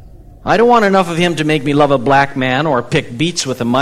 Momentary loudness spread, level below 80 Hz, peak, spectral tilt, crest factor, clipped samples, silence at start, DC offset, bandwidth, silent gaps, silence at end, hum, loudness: 7 LU; -42 dBFS; 0 dBFS; -5 dB/octave; 14 dB; under 0.1%; 0.05 s; under 0.1%; 15 kHz; none; 0 s; none; -13 LUFS